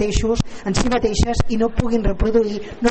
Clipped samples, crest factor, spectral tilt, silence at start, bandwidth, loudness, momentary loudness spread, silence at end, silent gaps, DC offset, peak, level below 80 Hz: under 0.1%; 14 dB; -5.5 dB/octave; 0 s; 8.8 kHz; -20 LUFS; 4 LU; 0 s; none; under 0.1%; -4 dBFS; -26 dBFS